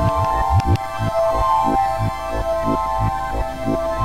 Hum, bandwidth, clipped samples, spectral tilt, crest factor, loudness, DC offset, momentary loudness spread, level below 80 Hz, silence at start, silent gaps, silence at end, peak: none; 16 kHz; under 0.1%; -7 dB/octave; 14 dB; -20 LUFS; 1%; 6 LU; -28 dBFS; 0 s; none; 0 s; -6 dBFS